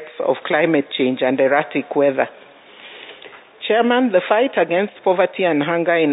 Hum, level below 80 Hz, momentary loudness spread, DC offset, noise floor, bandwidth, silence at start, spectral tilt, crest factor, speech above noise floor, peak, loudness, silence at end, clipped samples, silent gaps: none; -74 dBFS; 13 LU; under 0.1%; -42 dBFS; 4 kHz; 0 s; -10.5 dB/octave; 16 dB; 25 dB; -2 dBFS; -18 LUFS; 0 s; under 0.1%; none